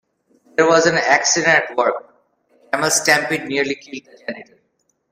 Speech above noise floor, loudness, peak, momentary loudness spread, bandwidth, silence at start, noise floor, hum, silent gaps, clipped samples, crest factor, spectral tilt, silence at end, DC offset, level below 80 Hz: 50 dB; -16 LUFS; 0 dBFS; 18 LU; 16 kHz; 0.6 s; -67 dBFS; none; none; under 0.1%; 20 dB; -2 dB/octave; 0.7 s; under 0.1%; -62 dBFS